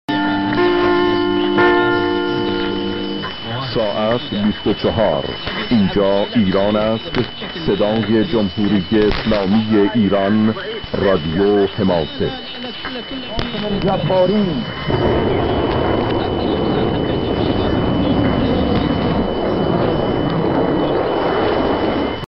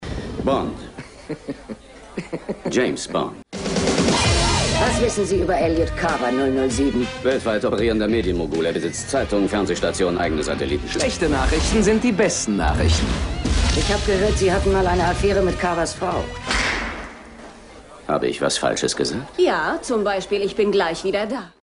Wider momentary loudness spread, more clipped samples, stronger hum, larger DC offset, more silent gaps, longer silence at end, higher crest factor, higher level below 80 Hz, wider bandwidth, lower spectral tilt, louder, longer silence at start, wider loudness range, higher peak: second, 8 LU vs 12 LU; neither; neither; neither; neither; second, 0 s vs 0.15 s; about the same, 16 dB vs 14 dB; about the same, -34 dBFS vs -30 dBFS; second, 6 kHz vs 11 kHz; first, -9 dB/octave vs -4.5 dB/octave; first, -17 LUFS vs -20 LUFS; about the same, 0.1 s vs 0 s; about the same, 3 LU vs 4 LU; first, 0 dBFS vs -6 dBFS